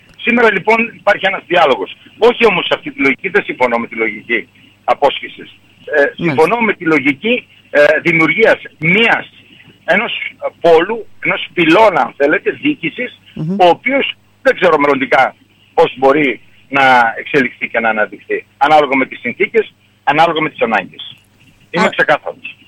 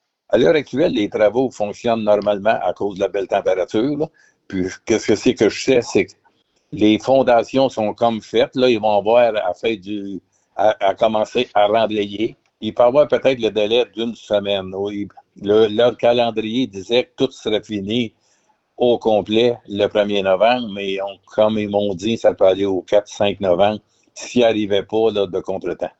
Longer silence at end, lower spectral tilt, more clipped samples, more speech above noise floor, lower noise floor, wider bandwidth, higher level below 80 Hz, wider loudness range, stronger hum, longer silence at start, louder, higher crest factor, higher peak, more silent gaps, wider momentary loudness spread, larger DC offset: about the same, 0.15 s vs 0.1 s; about the same, -5.5 dB/octave vs -5 dB/octave; neither; second, 35 dB vs 44 dB; second, -48 dBFS vs -62 dBFS; first, 13 kHz vs 8.2 kHz; about the same, -52 dBFS vs -54 dBFS; about the same, 3 LU vs 3 LU; neither; about the same, 0.2 s vs 0.3 s; first, -13 LUFS vs -18 LUFS; about the same, 14 dB vs 14 dB; first, 0 dBFS vs -4 dBFS; neither; about the same, 10 LU vs 10 LU; neither